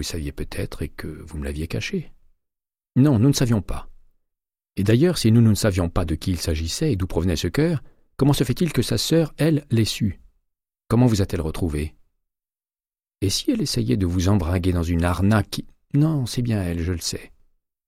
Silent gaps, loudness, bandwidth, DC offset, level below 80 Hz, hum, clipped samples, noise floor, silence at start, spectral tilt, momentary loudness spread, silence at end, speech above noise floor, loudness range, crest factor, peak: none; -22 LUFS; 16 kHz; under 0.1%; -36 dBFS; none; under 0.1%; under -90 dBFS; 0 s; -6 dB/octave; 13 LU; 0.6 s; over 69 dB; 4 LU; 16 dB; -6 dBFS